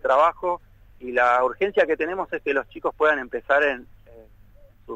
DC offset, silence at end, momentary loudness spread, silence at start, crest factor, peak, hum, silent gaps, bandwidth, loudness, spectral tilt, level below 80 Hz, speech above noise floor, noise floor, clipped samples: under 0.1%; 0 s; 10 LU; 0.05 s; 16 dB; -6 dBFS; none; none; 9 kHz; -22 LUFS; -5 dB/octave; -52 dBFS; 28 dB; -50 dBFS; under 0.1%